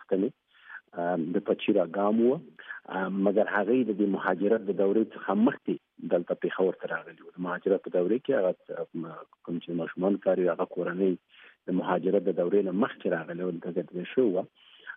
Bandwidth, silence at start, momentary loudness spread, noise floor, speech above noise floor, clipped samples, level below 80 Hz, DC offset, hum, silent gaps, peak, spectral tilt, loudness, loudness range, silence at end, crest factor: 3.8 kHz; 0 s; 12 LU; -49 dBFS; 21 dB; under 0.1%; -82 dBFS; under 0.1%; none; none; -12 dBFS; -6 dB/octave; -28 LUFS; 3 LU; 0 s; 18 dB